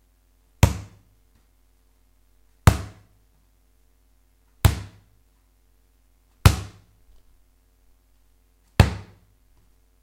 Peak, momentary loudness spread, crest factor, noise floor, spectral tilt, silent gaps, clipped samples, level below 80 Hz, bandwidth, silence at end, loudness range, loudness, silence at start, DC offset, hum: 0 dBFS; 22 LU; 26 dB; -61 dBFS; -5.5 dB/octave; none; under 0.1%; -34 dBFS; 16 kHz; 1 s; 5 LU; -22 LUFS; 0.65 s; under 0.1%; none